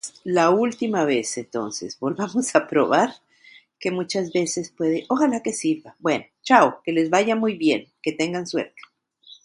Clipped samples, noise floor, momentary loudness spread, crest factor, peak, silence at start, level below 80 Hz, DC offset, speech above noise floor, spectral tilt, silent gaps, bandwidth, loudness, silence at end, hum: under 0.1%; -52 dBFS; 10 LU; 22 dB; 0 dBFS; 0.05 s; -70 dBFS; under 0.1%; 30 dB; -4.5 dB/octave; none; 11.5 kHz; -22 LUFS; 0.1 s; none